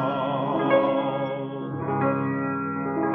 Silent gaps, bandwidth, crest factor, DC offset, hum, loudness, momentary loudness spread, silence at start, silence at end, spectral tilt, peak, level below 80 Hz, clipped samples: none; 4.1 kHz; 16 dB; under 0.1%; none; -25 LUFS; 9 LU; 0 s; 0 s; -10 dB/octave; -8 dBFS; -62 dBFS; under 0.1%